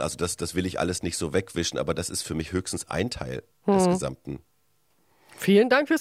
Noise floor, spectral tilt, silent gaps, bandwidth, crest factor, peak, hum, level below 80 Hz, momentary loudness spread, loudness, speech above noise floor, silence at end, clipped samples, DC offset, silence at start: -70 dBFS; -4.5 dB/octave; none; 15.5 kHz; 18 dB; -8 dBFS; none; -52 dBFS; 12 LU; -26 LUFS; 45 dB; 0 s; under 0.1%; under 0.1%; 0 s